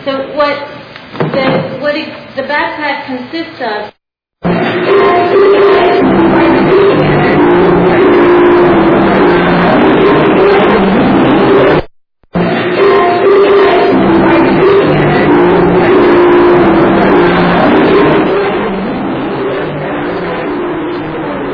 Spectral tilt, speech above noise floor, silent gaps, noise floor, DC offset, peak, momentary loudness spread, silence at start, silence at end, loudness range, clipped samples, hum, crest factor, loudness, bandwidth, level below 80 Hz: -9 dB/octave; 25 dB; none; -38 dBFS; under 0.1%; 0 dBFS; 11 LU; 0 s; 0 s; 8 LU; 0.9%; none; 8 dB; -8 LUFS; 5.4 kHz; -34 dBFS